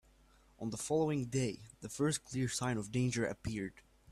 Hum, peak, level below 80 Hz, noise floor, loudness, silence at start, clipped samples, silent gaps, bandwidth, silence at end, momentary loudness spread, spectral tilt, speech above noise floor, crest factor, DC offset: none; -22 dBFS; -62 dBFS; -66 dBFS; -37 LUFS; 0.6 s; under 0.1%; none; 14 kHz; 0 s; 11 LU; -5 dB/octave; 29 dB; 16 dB; under 0.1%